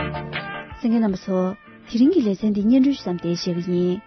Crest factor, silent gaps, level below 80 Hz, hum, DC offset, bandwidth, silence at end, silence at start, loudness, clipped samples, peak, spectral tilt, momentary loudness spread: 14 dB; none; -50 dBFS; none; under 0.1%; 6.4 kHz; 0.05 s; 0 s; -21 LUFS; under 0.1%; -8 dBFS; -7 dB/octave; 11 LU